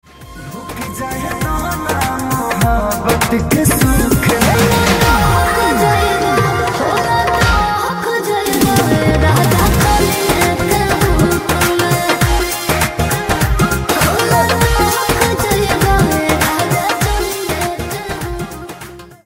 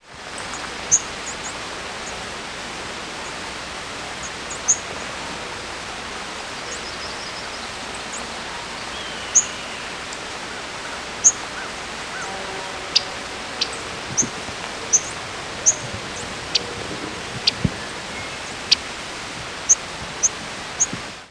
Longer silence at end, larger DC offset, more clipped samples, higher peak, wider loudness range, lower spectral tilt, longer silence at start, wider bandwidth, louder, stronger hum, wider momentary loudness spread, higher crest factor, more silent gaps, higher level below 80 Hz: about the same, 0.1 s vs 0 s; neither; neither; about the same, 0 dBFS vs 0 dBFS; second, 3 LU vs 7 LU; first, -4.5 dB/octave vs -0.5 dB/octave; first, 0.2 s vs 0.05 s; first, 16.5 kHz vs 11 kHz; first, -14 LUFS vs -23 LUFS; neither; about the same, 10 LU vs 12 LU; second, 14 dB vs 26 dB; neither; first, -24 dBFS vs -48 dBFS